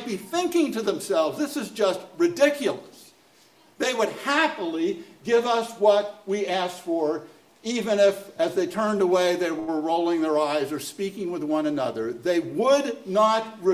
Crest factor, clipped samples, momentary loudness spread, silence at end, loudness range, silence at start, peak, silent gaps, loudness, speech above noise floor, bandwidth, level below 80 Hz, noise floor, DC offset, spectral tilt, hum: 18 dB; under 0.1%; 8 LU; 0 s; 2 LU; 0 s; -6 dBFS; none; -24 LUFS; 33 dB; 16 kHz; -70 dBFS; -57 dBFS; under 0.1%; -4 dB/octave; none